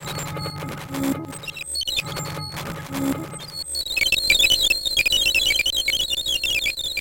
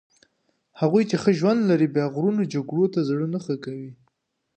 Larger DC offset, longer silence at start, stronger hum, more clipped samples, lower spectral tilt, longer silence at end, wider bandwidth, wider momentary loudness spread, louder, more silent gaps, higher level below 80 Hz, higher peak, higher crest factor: neither; second, 0 s vs 0.75 s; neither; neither; second, -1.5 dB/octave vs -7.5 dB/octave; second, 0 s vs 0.65 s; first, 17 kHz vs 8.8 kHz; first, 15 LU vs 10 LU; first, -20 LUFS vs -23 LUFS; neither; first, -44 dBFS vs -70 dBFS; about the same, -4 dBFS vs -6 dBFS; about the same, 18 dB vs 18 dB